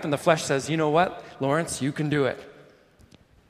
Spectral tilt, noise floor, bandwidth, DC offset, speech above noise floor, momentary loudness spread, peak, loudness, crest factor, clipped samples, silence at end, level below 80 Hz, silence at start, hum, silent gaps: -5 dB/octave; -55 dBFS; 15.5 kHz; under 0.1%; 31 dB; 6 LU; -4 dBFS; -25 LUFS; 22 dB; under 0.1%; 0.85 s; -60 dBFS; 0 s; none; none